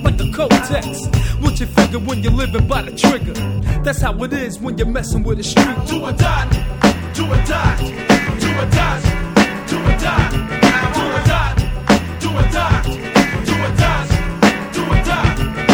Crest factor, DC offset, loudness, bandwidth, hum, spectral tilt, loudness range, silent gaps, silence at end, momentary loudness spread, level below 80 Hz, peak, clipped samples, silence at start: 16 dB; under 0.1%; -16 LUFS; 19.5 kHz; none; -5.5 dB/octave; 2 LU; none; 0 s; 6 LU; -22 dBFS; 0 dBFS; under 0.1%; 0 s